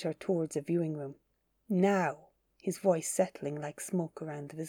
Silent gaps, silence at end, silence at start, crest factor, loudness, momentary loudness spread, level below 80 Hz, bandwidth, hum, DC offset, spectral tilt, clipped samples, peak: none; 0 s; 0 s; 20 dB; -33 LUFS; 13 LU; -78 dBFS; 18.5 kHz; none; under 0.1%; -6 dB/octave; under 0.1%; -14 dBFS